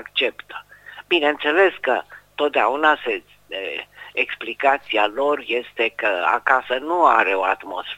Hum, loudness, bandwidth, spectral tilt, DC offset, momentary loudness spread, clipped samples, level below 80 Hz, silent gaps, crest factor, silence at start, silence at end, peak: 50 Hz at -60 dBFS; -20 LUFS; 16 kHz; -3.5 dB/octave; under 0.1%; 13 LU; under 0.1%; -64 dBFS; none; 20 dB; 0 s; 0 s; 0 dBFS